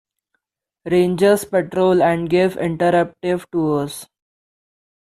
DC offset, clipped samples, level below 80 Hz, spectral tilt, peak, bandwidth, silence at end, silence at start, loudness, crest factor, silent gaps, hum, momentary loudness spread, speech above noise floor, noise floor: under 0.1%; under 0.1%; -54 dBFS; -6.5 dB/octave; -4 dBFS; 14 kHz; 1 s; 0.85 s; -18 LUFS; 16 dB; none; none; 8 LU; 61 dB; -78 dBFS